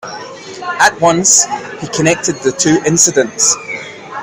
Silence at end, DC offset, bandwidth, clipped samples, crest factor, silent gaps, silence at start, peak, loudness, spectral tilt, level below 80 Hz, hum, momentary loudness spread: 0 s; under 0.1%; over 20 kHz; 0.1%; 14 dB; none; 0.05 s; 0 dBFS; -11 LUFS; -2.5 dB/octave; -50 dBFS; none; 17 LU